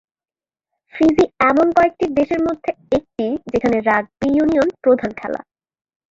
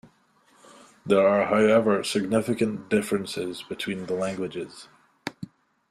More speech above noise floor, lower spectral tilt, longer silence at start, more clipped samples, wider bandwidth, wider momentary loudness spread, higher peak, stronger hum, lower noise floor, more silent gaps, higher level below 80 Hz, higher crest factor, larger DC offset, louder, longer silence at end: first, over 73 dB vs 38 dB; about the same, -6.5 dB/octave vs -5.5 dB/octave; about the same, 0.95 s vs 1.05 s; neither; second, 7.8 kHz vs 14 kHz; second, 10 LU vs 19 LU; first, -2 dBFS vs -8 dBFS; neither; first, under -90 dBFS vs -62 dBFS; neither; first, -48 dBFS vs -64 dBFS; about the same, 16 dB vs 18 dB; neither; first, -17 LUFS vs -24 LUFS; first, 0.75 s vs 0.45 s